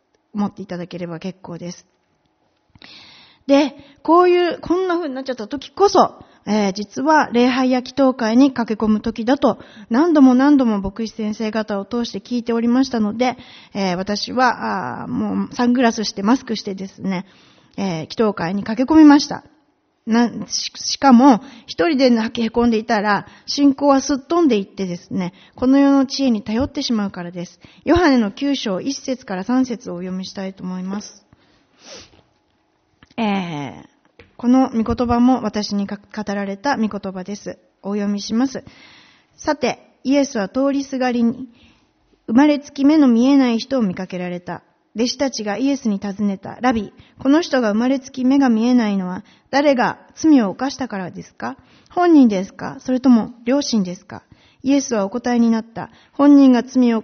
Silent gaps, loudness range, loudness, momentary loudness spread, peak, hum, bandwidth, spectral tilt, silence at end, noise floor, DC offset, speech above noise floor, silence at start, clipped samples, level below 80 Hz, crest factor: none; 8 LU; -18 LUFS; 16 LU; 0 dBFS; none; 6.6 kHz; -4.5 dB/octave; 0 s; -64 dBFS; under 0.1%; 46 dB; 0.35 s; under 0.1%; -50 dBFS; 18 dB